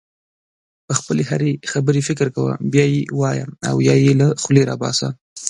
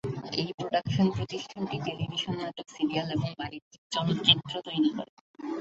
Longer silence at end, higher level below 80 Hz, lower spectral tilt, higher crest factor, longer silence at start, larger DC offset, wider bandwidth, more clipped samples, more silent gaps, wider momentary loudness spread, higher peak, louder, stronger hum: about the same, 0 s vs 0 s; about the same, -56 dBFS vs -58 dBFS; about the same, -5.5 dB/octave vs -5.5 dB/octave; second, 18 dB vs 24 dB; first, 0.9 s vs 0.05 s; neither; first, 11.5 kHz vs 8 kHz; neither; second, 5.21-5.36 s vs 0.54-0.58 s, 3.62-3.71 s, 3.78-3.90 s, 5.09-5.34 s; second, 8 LU vs 15 LU; first, 0 dBFS vs -6 dBFS; first, -18 LUFS vs -29 LUFS; neither